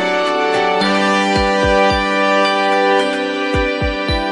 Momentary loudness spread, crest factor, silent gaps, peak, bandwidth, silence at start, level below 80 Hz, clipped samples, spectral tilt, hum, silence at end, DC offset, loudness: 4 LU; 14 dB; none; -2 dBFS; 11.5 kHz; 0 s; -30 dBFS; under 0.1%; -4.5 dB/octave; none; 0 s; under 0.1%; -15 LUFS